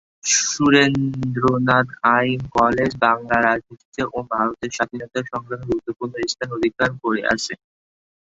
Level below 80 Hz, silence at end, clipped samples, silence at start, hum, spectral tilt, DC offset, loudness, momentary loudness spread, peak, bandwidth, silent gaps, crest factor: -50 dBFS; 0.75 s; under 0.1%; 0.25 s; none; -4 dB/octave; under 0.1%; -20 LUFS; 11 LU; 0 dBFS; 8 kHz; 3.85-3.92 s; 20 dB